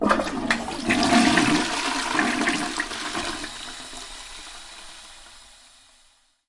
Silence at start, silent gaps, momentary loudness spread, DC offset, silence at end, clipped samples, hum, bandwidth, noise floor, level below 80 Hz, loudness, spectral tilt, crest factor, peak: 0 s; none; 22 LU; under 0.1%; 1.05 s; under 0.1%; none; 11.5 kHz; -60 dBFS; -48 dBFS; -23 LUFS; -3 dB/octave; 24 dB; -2 dBFS